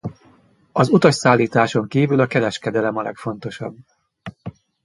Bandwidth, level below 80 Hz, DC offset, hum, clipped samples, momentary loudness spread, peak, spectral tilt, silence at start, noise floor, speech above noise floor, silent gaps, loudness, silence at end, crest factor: 11.5 kHz; -56 dBFS; under 0.1%; none; under 0.1%; 21 LU; 0 dBFS; -6 dB/octave; 0.05 s; -54 dBFS; 36 dB; none; -18 LUFS; 0.35 s; 20 dB